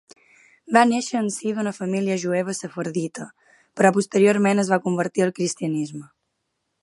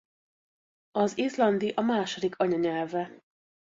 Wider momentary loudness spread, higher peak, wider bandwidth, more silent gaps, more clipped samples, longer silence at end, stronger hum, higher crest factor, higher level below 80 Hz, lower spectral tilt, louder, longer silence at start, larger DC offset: first, 13 LU vs 8 LU; first, 0 dBFS vs -12 dBFS; first, 11.5 kHz vs 7.8 kHz; neither; neither; about the same, 0.75 s vs 0.65 s; neither; about the same, 22 dB vs 18 dB; about the same, -72 dBFS vs -72 dBFS; about the same, -5.5 dB/octave vs -5.5 dB/octave; first, -22 LUFS vs -28 LUFS; second, 0.7 s vs 0.95 s; neither